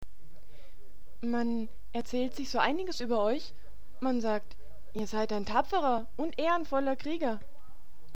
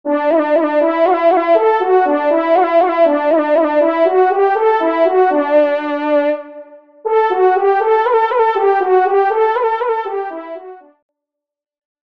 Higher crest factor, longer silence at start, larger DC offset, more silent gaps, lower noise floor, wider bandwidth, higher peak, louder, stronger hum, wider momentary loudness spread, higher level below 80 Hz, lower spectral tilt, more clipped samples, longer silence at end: first, 20 dB vs 14 dB; about the same, 0 s vs 0.05 s; first, 3% vs 0.3%; neither; second, -54 dBFS vs -81 dBFS; first, 16 kHz vs 5.6 kHz; second, -12 dBFS vs 0 dBFS; second, -32 LUFS vs -14 LUFS; neither; about the same, 9 LU vs 7 LU; first, -54 dBFS vs -68 dBFS; about the same, -5 dB/octave vs -5 dB/octave; neither; second, 0.2 s vs 1.3 s